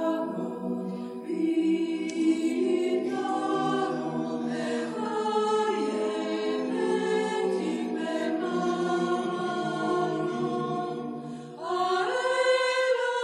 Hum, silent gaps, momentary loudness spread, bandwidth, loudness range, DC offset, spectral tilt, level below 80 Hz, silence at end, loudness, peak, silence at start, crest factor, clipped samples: none; none; 7 LU; 11 kHz; 2 LU; under 0.1%; -5 dB/octave; -78 dBFS; 0 s; -28 LUFS; -14 dBFS; 0 s; 14 dB; under 0.1%